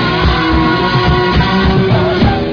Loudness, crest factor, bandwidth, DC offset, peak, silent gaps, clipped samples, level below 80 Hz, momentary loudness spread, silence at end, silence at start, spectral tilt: -11 LUFS; 10 dB; 5.4 kHz; under 0.1%; 0 dBFS; none; under 0.1%; -20 dBFS; 1 LU; 0 s; 0 s; -7.5 dB/octave